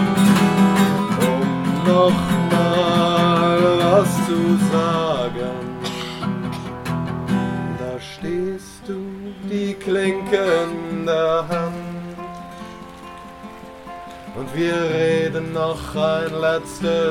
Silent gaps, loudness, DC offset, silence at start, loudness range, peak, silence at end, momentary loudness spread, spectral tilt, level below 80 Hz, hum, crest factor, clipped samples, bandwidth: none; -19 LUFS; under 0.1%; 0 s; 9 LU; -2 dBFS; 0 s; 19 LU; -6 dB/octave; -46 dBFS; none; 18 dB; under 0.1%; 17 kHz